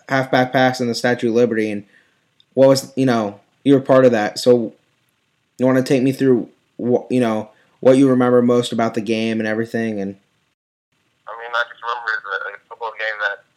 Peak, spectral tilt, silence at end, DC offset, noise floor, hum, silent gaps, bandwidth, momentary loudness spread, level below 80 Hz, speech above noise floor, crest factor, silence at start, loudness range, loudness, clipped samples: -2 dBFS; -6 dB/octave; 0.2 s; under 0.1%; -66 dBFS; none; 10.54-10.92 s; 14 kHz; 14 LU; -72 dBFS; 50 dB; 16 dB; 0.1 s; 8 LU; -17 LUFS; under 0.1%